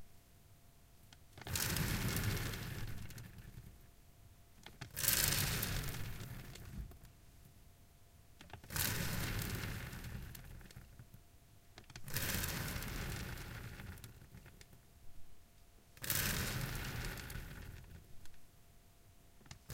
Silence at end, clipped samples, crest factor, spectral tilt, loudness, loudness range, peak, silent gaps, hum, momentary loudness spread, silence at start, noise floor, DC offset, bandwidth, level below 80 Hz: 0 s; under 0.1%; 32 dB; -3 dB/octave; -40 LUFS; 8 LU; -12 dBFS; none; none; 24 LU; 0 s; -63 dBFS; under 0.1%; 17 kHz; -52 dBFS